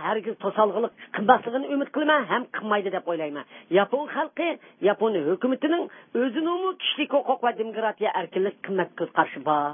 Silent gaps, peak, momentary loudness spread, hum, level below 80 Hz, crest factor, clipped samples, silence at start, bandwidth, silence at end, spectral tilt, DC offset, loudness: none; -2 dBFS; 7 LU; none; -84 dBFS; 22 dB; under 0.1%; 0 s; 3.7 kHz; 0 s; -9.5 dB/octave; under 0.1%; -25 LUFS